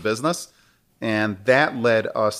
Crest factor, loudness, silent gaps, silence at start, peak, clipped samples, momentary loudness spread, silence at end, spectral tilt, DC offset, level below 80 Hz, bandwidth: 18 dB; -21 LUFS; none; 0 s; -4 dBFS; under 0.1%; 12 LU; 0 s; -4.5 dB/octave; under 0.1%; -66 dBFS; 15.5 kHz